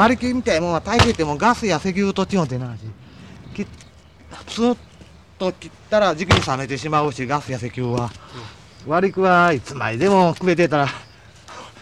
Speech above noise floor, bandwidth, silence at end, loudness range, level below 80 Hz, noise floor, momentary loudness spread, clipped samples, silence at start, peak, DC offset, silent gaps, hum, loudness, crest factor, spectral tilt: 26 dB; 12.5 kHz; 0 s; 7 LU; -42 dBFS; -45 dBFS; 21 LU; under 0.1%; 0 s; -2 dBFS; 0.1%; none; none; -19 LUFS; 18 dB; -5.5 dB/octave